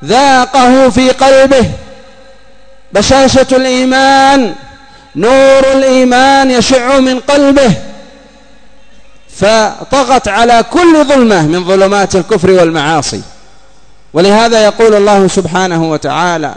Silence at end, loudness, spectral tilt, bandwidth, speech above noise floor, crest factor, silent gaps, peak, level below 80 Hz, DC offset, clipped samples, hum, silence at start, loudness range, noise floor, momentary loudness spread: 0 s; -7 LUFS; -4.5 dB/octave; 11 kHz; 37 dB; 8 dB; none; 0 dBFS; -34 dBFS; 2%; 2%; none; 0 s; 4 LU; -43 dBFS; 7 LU